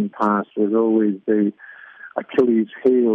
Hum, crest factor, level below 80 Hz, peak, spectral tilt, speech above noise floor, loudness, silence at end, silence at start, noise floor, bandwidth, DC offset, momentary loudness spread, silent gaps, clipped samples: none; 14 dB; -68 dBFS; -6 dBFS; -9.5 dB/octave; 22 dB; -19 LUFS; 0 s; 0 s; -41 dBFS; 4.6 kHz; under 0.1%; 10 LU; none; under 0.1%